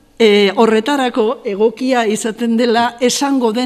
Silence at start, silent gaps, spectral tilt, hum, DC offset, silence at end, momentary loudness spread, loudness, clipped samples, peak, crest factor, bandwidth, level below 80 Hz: 0.2 s; none; -4 dB/octave; none; under 0.1%; 0 s; 6 LU; -14 LUFS; under 0.1%; 0 dBFS; 14 dB; 14 kHz; -56 dBFS